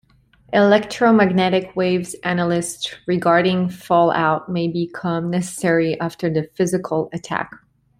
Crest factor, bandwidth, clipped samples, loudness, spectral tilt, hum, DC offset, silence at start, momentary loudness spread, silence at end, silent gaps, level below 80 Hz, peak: 16 dB; 14.5 kHz; under 0.1%; -19 LUFS; -5.5 dB/octave; none; under 0.1%; 0.5 s; 9 LU; 0.45 s; none; -58 dBFS; -2 dBFS